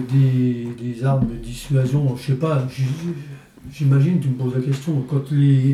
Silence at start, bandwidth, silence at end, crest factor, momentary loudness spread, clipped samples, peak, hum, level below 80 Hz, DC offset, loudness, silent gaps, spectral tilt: 0 s; 12 kHz; 0 s; 12 dB; 12 LU; under 0.1%; -6 dBFS; none; -44 dBFS; under 0.1%; -20 LUFS; none; -8.5 dB/octave